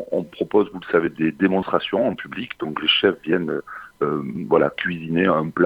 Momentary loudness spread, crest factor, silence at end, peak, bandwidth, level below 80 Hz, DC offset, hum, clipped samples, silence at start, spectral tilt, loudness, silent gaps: 10 LU; 18 dB; 0 s; -2 dBFS; 5.4 kHz; -58 dBFS; under 0.1%; none; under 0.1%; 0 s; -7.5 dB/octave; -21 LUFS; none